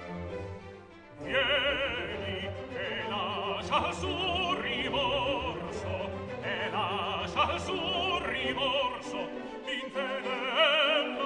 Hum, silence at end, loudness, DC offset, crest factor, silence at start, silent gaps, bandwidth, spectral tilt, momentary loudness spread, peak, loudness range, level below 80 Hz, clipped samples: none; 0 s; -30 LUFS; under 0.1%; 20 dB; 0 s; none; 10 kHz; -4 dB/octave; 12 LU; -12 dBFS; 2 LU; -54 dBFS; under 0.1%